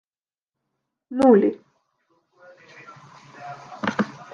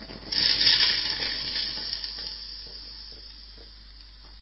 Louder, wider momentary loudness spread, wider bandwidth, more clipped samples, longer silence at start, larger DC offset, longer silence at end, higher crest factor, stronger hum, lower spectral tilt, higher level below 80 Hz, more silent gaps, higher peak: first, -20 LUFS vs -23 LUFS; about the same, 26 LU vs 24 LU; first, 11 kHz vs 8 kHz; neither; first, 1.1 s vs 0 s; neither; about the same, 0.1 s vs 0 s; about the same, 22 dB vs 22 dB; neither; first, -7 dB/octave vs -3.5 dB/octave; second, -66 dBFS vs -48 dBFS; neither; first, -4 dBFS vs -8 dBFS